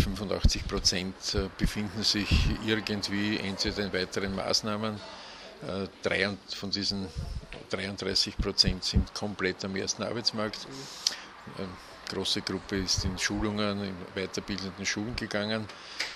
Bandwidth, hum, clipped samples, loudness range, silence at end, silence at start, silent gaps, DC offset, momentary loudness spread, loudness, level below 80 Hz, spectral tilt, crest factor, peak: 14 kHz; none; under 0.1%; 4 LU; 0 s; 0 s; none; under 0.1%; 13 LU; -30 LUFS; -38 dBFS; -3.5 dB/octave; 26 dB; -6 dBFS